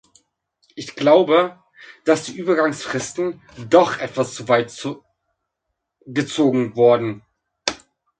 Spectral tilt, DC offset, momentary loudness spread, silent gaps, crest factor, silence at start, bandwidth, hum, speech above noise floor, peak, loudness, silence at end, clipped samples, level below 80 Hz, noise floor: -5 dB/octave; under 0.1%; 15 LU; none; 20 dB; 0.75 s; 9.4 kHz; none; 60 dB; 0 dBFS; -19 LUFS; 0.45 s; under 0.1%; -62 dBFS; -78 dBFS